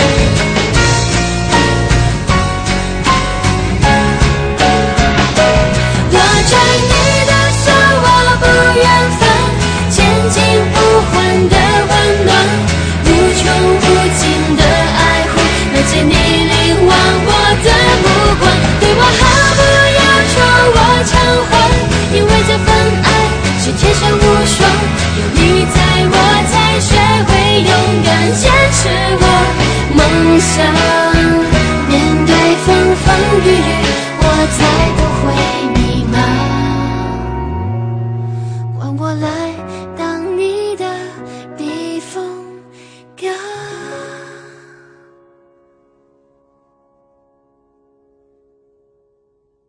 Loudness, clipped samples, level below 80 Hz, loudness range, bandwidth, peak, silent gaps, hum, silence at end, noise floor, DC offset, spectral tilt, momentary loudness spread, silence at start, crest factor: -10 LUFS; 0.1%; -22 dBFS; 11 LU; 11 kHz; 0 dBFS; none; none; 5.3 s; -61 dBFS; under 0.1%; -4.5 dB/octave; 12 LU; 0 s; 10 dB